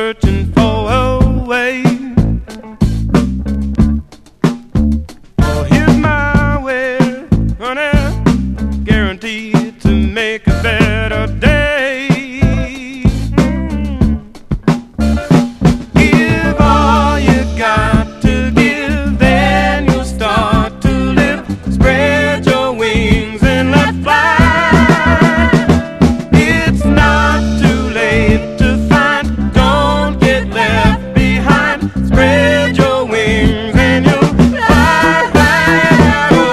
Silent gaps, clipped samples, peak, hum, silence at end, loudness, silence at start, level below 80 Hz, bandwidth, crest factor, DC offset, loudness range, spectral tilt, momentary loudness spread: none; 0.3%; 0 dBFS; none; 0 s; -12 LUFS; 0 s; -20 dBFS; 14 kHz; 12 dB; under 0.1%; 5 LU; -6.5 dB/octave; 7 LU